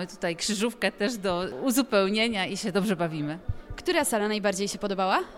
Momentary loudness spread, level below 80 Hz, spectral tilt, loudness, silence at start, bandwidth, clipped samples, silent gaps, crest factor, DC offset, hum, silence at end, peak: 8 LU; -48 dBFS; -4 dB/octave; -27 LUFS; 0 s; 17 kHz; under 0.1%; none; 18 dB; under 0.1%; none; 0 s; -10 dBFS